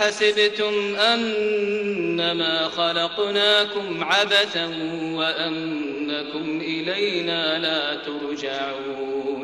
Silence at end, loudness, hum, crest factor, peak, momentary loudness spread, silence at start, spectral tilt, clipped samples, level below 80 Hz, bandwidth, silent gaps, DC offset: 0 s; -22 LUFS; none; 16 dB; -6 dBFS; 10 LU; 0 s; -3.5 dB/octave; under 0.1%; -64 dBFS; 12 kHz; none; under 0.1%